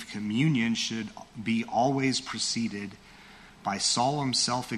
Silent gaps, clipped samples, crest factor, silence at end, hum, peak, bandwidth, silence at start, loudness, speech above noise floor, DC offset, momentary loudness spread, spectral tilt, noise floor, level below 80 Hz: none; under 0.1%; 16 dB; 0 s; none; -12 dBFS; 13 kHz; 0 s; -28 LUFS; 23 dB; under 0.1%; 12 LU; -3.5 dB/octave; -51 dBFS; -62 dBFS